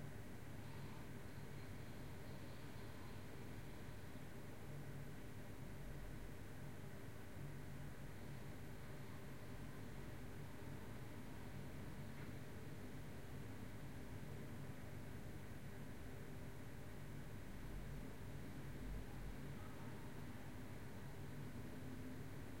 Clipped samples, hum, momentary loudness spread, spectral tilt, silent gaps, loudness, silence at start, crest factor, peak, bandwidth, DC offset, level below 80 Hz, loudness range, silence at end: under 0.1%; none; 2 LU; -6 dB/octave; none; -55 LUFS; 0 s; 14 dB; -38 dBFS; 16.5 kHz; 0.2%; -62 dBFS; 1 LU; 0 s